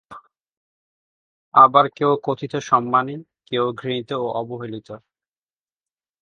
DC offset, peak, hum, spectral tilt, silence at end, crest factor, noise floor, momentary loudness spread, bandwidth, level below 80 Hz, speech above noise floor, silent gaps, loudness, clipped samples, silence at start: under 0.1%; 0 dBFS; none; -6 dB/octave; 1.25 s; 22 dB; under -90 dBFS; 20 LU; 7.2 kHz; -66 dBFS; over 71 dB; 0.52-1.52 s; -19 LUFS; under 0.1%; 0.1 s